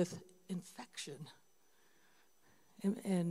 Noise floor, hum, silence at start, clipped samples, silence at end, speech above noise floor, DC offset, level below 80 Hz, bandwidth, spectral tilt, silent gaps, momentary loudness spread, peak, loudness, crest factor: -74 dBFS; none; 0 s; under 0.1%; 0 s; 35 dB; under 0.1%; -84 dBFS; 16 kHz; -6 dB/octave; none; 16 LU; -24 dBFS; -43 LUFS; 20 dB